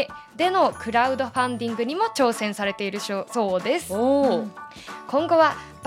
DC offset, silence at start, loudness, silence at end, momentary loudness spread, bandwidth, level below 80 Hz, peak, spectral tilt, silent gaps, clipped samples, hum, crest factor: under 0.1%; 0 s; -23 LUFS; 0 s; 9 LU; 15.5 kHz; -60 dBFS; -6 dBFS; -4.5 dB/octave; none; under 0.1%; none; 18 dB